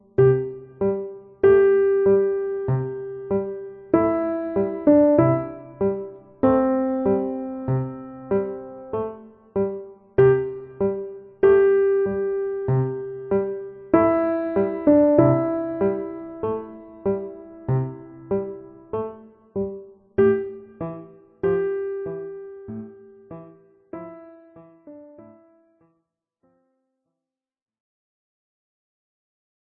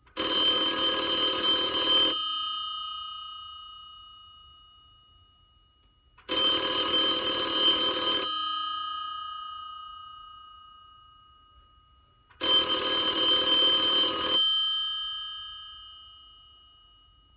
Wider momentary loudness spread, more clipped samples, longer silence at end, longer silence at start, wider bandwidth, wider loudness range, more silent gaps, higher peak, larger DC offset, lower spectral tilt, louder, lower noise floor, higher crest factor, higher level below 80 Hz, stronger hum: about the same, 19 LU vs 21 LU; neither; first, 4.45 s vs 1.1 s; about the same, 0.2 s vs 0.15 s; second, 3.4 kHz vs 4 kHz; second, 9 LU vs 16 LU; neither; first, -2 dBFS vs -14 dBFS; neither; first, -13 dB/octave vs 1.5 dB/octave; about the same, -22 LUFS vs -24 LUFS; first, -87 dBFS vs -63 dBFS; about the same, 20 dB vs 16 dB; first, -54 dBFS vs -60 dBFS; neither